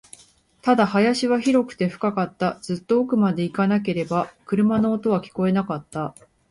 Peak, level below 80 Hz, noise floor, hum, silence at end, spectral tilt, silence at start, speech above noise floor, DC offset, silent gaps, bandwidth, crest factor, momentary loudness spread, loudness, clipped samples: -6 dBFS; -60 dBFS; -55 dBFS; none; 0.4 s; -6.5 dB/octave; 0.65 s; 34 dB; under 0.1%; none; 11.5 kHz; 16 dB; 9 LU; -22 LUFS; under 0.1%